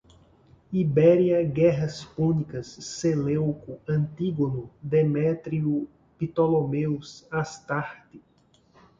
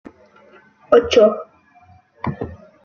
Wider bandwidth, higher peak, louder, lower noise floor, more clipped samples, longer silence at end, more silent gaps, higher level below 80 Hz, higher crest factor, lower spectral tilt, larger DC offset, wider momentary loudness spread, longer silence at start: about the same, 7.6 kHz vs 7.2 kHz; second, -8 dBFS vs 0 dBFS; second, -25 LUFS vs -16 LUFS; first, -62 dBFS vs -51 dBFS; neither; first, 0.8 s vs 0.3 s; neither; about the same, -56 dBFS vs -52 dBFS; about the same, 18 dB vs 20 dB; first, -7.5 dB/octave vs -5.5 dB/octave; neither; second, 13 LU vs 18 LU; second, 0.7 s vs 0.9 s